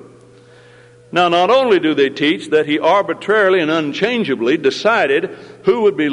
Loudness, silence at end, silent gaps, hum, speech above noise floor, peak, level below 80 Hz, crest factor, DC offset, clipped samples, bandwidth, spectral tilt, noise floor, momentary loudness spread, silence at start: -15 LUFS; 0 s; none; none; 29 dB; -2 dBFS; -62 dBFS; 14 dB; under 0.1%; under 0.1%; 10.5 kHz; -5 dB/octave; -44 dBFS; 5 LU; 1.1 s